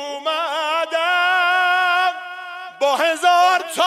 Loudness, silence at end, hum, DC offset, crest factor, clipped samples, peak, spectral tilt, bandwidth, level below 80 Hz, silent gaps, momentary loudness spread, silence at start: -17 LUFS; 0 s; none; under 0.1%; 14 dB; under 0.1%; -4 dBFS; 0.5 dB/octave; 15.5 kHz; -80 dBFS; none; 12 LU; 0 s